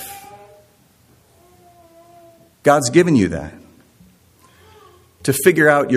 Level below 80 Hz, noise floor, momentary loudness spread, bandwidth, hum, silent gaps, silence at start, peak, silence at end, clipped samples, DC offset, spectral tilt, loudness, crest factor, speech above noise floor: -52 dBFS; -54 dBFS; 21 LU; 15.5 kHz; none; none; 0 s; 0 dBFS; 0 s; under 0.1%; under 0.1%; -5 dB/octave; -15 LUFS; 20 dB; 40 dB